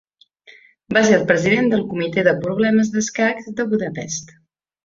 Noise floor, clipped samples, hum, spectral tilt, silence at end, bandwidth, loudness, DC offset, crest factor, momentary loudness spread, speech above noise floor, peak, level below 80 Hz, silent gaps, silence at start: -50 dBFS; under 0.1%; none; -5 dB/octave; 0.6 s; 7.6 kHz; -18 LUFS; under 0.1%; 18 dB; 10 LU; 32 dB; -2 dBFS; -58 dBFS; none; 0.5 s